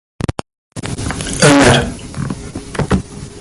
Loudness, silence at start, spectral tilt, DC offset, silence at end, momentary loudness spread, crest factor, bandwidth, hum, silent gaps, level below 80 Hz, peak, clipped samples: -15 LUFS; 0.2 s; -4.5 dB/octave; under 0.1%; 0 s; 19 LU; 16 dB; 12 kHz; none; 0.58-0.70 s; -30 dBFS; 0 dBFS; under 0.1%